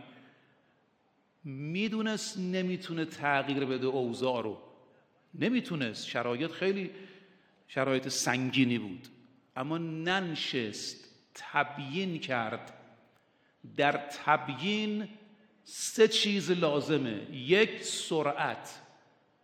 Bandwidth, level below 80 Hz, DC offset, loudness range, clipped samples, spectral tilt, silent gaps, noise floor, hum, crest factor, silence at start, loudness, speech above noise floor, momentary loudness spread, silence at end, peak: 16.5 kHz; -78 dBFS; under 0.1%; 6 LU; under 0.1%; -4 dB/octave; none; -71 dBFS; none; 24 dB; 0 s; -31 LUFS; 40 dB; 15 LU; 0.6 s; -10 dBFS